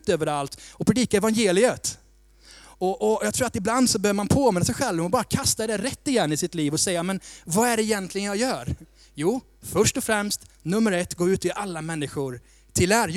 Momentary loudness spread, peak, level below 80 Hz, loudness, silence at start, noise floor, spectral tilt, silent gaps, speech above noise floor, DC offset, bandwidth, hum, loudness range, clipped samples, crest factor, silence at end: 10 LU; -4 dBFS; -48 dBFS; -24 LUFS; 0.05 s; -53 dBFS; -4 dB/octave; none; 29 dB; under 0.1%; 16.5 kHz; none; 3 LU; under 0.1%; 20 dB; 0 s